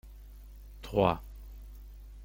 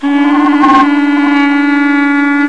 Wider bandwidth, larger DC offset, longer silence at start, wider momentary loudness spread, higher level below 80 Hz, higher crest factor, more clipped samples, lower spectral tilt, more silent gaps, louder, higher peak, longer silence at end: first, 17 kHz vs 8 kHz; second, under 0.1% vs 1%; about the same, 0.05 s vs 0 s; first, 24 LU vs 3 LU; about the same, -46 dBFS vs -48 dBFS; first, 26 dB vs 8 dB; neither; first, -7.5 dB/octave vs -4.5 dB/octave; neither; second, -30 LUFS vs -9 LUFS; second, -10 dBFS vs 0 dBFS; about the same, 0 s vs 0 s